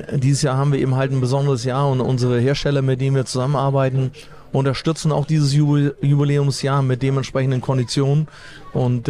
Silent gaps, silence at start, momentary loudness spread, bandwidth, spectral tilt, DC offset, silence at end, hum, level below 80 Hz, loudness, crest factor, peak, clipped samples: none; 0 s; 4 LU; 11 kHz; -6.5 dB/octave; under 0.1%; 0 s; none; -44 dBFS; -19 LUFS; 12 dB; -6 dBFS; under 0.1%